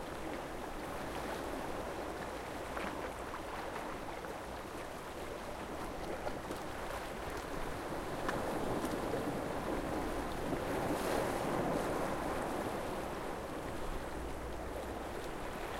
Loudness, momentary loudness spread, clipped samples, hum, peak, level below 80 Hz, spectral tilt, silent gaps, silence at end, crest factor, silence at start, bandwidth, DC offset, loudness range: -40 LUFS; 7 LU; under 0.1%; none; -22 dBFS; -50 dBFS; -5 dB/octave; none; 0 s; 18 dB; 0 s; 16 kHz; under 0.1%; 6 LU